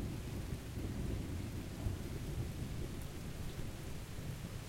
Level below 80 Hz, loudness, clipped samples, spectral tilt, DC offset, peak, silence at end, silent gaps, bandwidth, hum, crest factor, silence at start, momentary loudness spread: -48 dBFS; -44 LUFS; under 0.1%; -6 dB/octave; under 0.1%; -26 dBFS; 0 s; none; 16.5 kHz; none; 16 dB; 0 s; 4 LU